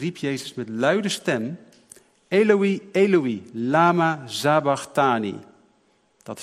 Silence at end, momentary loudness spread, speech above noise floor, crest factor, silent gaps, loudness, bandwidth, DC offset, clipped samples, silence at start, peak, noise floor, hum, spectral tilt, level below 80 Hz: 0 s; 13 LU; 42 dB; 20 dB; none; -22 LUFS; 15 kHz; under 0.1%; under 0.1%; 0 s; -4 dBFS; -63 dBFS; none; -5.5 dB/octave; -72 dBFS